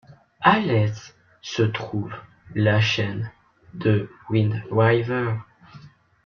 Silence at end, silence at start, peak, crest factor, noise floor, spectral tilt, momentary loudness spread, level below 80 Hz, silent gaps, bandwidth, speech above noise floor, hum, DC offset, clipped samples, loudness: 0.4 s; 0.1 s; -2 dBFS; 22 dB; -48 dBFS; -6.5 dB/octave; 16 LU; -56 dBFS; none; 6.8 kHz; 26 dB; none; under 0.1%; under 0.1%; -23 LUFS